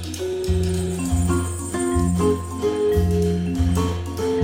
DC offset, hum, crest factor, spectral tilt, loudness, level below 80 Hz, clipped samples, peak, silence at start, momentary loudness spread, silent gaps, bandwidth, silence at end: under 0.1%; none; 14 dB; -6.5 dB/octave; -22 LUFS; -30 dBFS; under 0.1%; -8 dBFS; 0 s; 5 LU; none; 16.5 kHz; 0 s